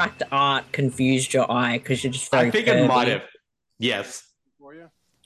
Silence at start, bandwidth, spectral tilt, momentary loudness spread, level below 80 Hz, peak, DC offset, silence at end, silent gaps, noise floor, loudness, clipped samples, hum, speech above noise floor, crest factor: 0 s; 12.5 kHz; -4.5 dB/octave; 9 LU; -60 dBFS; -4 dBFS; under 0.1%; 0.45 s; none; -50 dBFS; -21 LUFS; under 0.1%; none; 28 dB; 18 dB